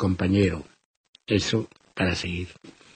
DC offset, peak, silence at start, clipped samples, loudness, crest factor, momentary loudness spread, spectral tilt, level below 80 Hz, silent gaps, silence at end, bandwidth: under 0.1%; -8 dBFS; 0 s; under 0.1%; -25 LUFS; 18 dB; 16 LU; -5.5 dB/octave; -48 dBFS; 0.85-1.13 s; 0.25 s; 9.2 kHz